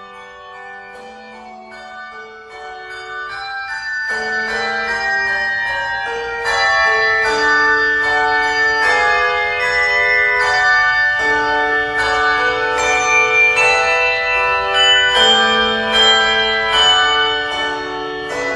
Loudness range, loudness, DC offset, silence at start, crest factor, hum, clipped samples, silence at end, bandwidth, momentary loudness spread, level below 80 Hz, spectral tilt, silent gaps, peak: 12 LU; -13 LUFS; under 0.1%; 0 s; 16 dB; none; under 0.1%; 0 s; 12 kHz; 20 LU; -44 dBFS; -1 dB/octave; none; 0 dBFS